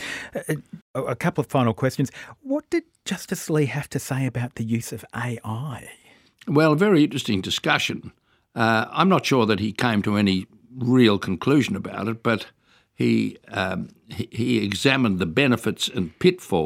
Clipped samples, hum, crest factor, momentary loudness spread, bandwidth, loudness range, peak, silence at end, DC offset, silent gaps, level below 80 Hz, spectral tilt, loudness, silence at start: under 0.1%; none; 20 dB; 12 LU; 16.5 kHz; 6 LU; -2 dBFS; 0 s; under 0.1%; 0.82-0.94 s; -60 dBFS; -5.5 dB/octave; -23 LUFS; 0 s